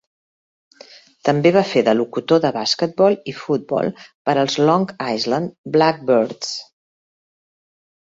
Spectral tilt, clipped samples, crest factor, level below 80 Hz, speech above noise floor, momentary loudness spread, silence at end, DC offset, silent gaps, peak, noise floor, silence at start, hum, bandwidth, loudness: -5.5 dB/octave; under 0.1%; 18 dB; -64 dBFS; 28 dB; 8 LU; 1.45 s; under 0.1%; 4.15-4.25 s, 5.58-5.64 s; -2 dBFS; -45 dBFS; 1.25 s; none; 7.8 kHz; -18 LUFS